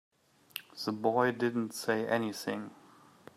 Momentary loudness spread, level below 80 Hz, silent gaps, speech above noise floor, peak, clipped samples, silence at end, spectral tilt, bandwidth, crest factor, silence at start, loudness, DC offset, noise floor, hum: 16 LU; -80 dBFS; none; 25 dB; -14 dBFS; under 0.1%; 0.6 s; -5 dB/octave; 15.5 kHz; 20 dB; 0.55 s; -33 LUFS; under 0.1%; -57 dBFS; none